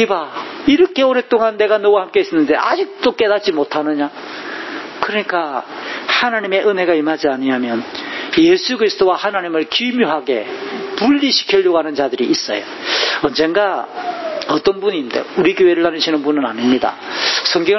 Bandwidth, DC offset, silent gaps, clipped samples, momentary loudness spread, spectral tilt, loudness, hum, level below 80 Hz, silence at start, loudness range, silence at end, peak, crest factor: 6.2 kHz; under 0.1%; none; under 0.1%; 10 LU; -4 dB/octave; -16 LUFS; none; -56 dBFS; 0 s; 3 LU; 0 s; 0 dBFS; 16 dB